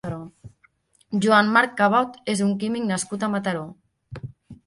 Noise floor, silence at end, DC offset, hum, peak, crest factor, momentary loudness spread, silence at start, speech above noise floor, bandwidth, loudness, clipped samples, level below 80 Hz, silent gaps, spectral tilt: -62 dBFS; 0.1 s; under 0.1%; none; -4 dBFS; 20 dB; 22 LU; 0.05 s; 40 dB; 11.5 kHz; -21 LUFS; under 0.1%; -60 dBFS; none; -5 dB/octave